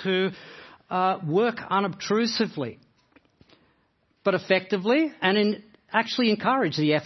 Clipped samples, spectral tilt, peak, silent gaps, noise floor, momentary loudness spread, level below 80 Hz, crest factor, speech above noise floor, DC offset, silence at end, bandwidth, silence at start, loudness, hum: under 0.1%; -5.5 dB/octave; -6 dBFS; none; -68 dBFS; 8 LU; -72 dBFS; 20 dB; 44 dB; under 0.1%; 0 s; 6.2 kHz; 0 s; -25 LUFS; none